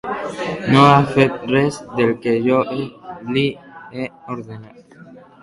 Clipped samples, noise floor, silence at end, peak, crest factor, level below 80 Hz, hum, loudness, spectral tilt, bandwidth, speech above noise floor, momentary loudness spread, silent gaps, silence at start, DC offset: under 0.1%; -42 dBFS; 0.25 s; 0 dBFS; 18 dB; -52 dBFS; none; -17 LUFS; -6.5 dB/octave; 11.5 kHz; 25 dB; 20 LU; none; 0.05 s; under 0.1%